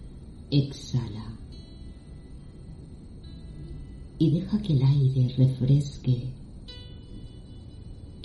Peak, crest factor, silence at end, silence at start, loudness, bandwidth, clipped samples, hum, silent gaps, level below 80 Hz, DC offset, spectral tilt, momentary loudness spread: -10 dBFS; 18 dB; 0 s; 0 s; -25 LUFS; 8.8 kHz; under 0.1%; none; none; -44 dBFS; under 0.1%; -8.5 dB/octave; 23 LU